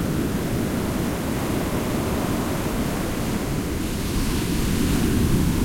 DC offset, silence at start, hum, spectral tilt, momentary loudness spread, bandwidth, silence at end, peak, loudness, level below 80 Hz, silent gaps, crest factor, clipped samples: under 0.1%; 0 s; none; -5.5 dB/octave; 5 LU; 16.5 kHz; 0 s; -8 dBFS; -24 LUFS; -32 dBFS; none; 14 dB; under 0.1%